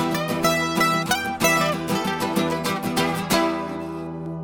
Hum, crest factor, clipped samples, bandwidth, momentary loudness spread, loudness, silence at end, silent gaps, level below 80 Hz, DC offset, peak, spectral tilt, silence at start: none; 18 dB; under 0.1%; 19.5 kHz; 10 LU; -22 LUFS; 0 s; none; -52 dBFS; under 0.1%; -4 dBFS; -4 dB/octave; 0 s